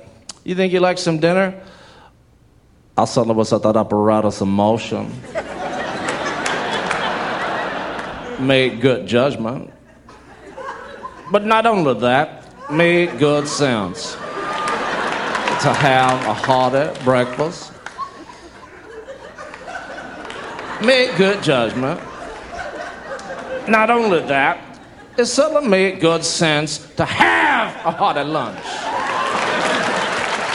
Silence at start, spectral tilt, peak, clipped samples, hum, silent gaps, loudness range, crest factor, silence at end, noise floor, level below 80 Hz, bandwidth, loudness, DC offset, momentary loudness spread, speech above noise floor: 0 s; -4.5 dB/octave; 0 dBFS; under 0.1%; none; none; 5 LU; 18 dB; 0 s; -51 dBFS; -52 dBFS; 11.5 kHz; -18 LUFS; under 0.1%; 17 LU; 35 dB